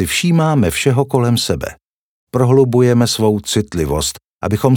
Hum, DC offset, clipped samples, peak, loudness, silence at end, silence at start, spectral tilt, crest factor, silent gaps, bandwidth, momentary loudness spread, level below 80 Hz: none; under 0.1%; under 0.1%; -2 dBFS; -15 LUFS; 0 s; 0 s; -5.5 dB/octave; 14 dB; 1.83-2.27 s, 4.27-4.39 s; 19.5 kHz; 9 LU; -38 dBFS